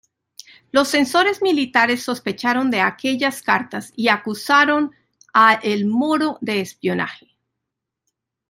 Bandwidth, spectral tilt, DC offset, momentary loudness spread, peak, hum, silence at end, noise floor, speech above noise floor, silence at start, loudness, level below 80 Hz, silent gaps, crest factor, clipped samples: 16 kHz; -4 dB/octave; under 0.1%; 9 LU; -2 dBFS; none; 1.35 s; -82 dBFS; 63 dB; 0.75 s; -18 LUFS; -66 dBFS; none; 18 dB; under 0.1%